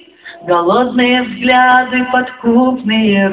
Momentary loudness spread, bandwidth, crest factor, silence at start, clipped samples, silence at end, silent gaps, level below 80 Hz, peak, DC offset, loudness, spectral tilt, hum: 6 LU; 4 kHz; 12 dB; 0.25 s; under 0.1%; 0 s; none; -48 dBFS; 0 dBFS; under 0.1%; -12 LUFS; -9 dB/octave; none